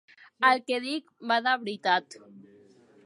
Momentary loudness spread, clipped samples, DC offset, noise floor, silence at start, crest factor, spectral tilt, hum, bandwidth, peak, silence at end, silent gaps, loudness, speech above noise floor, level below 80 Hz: 8 LU; under 0.1%; under 0.1%; -57 dBFS; 0.4 s; 22 dB; -3.5 dB/octave; none; 11.5 kHz; -8 dBFS; 0.65 s; none; -27 LUFS; 30 dB; -86 dBFS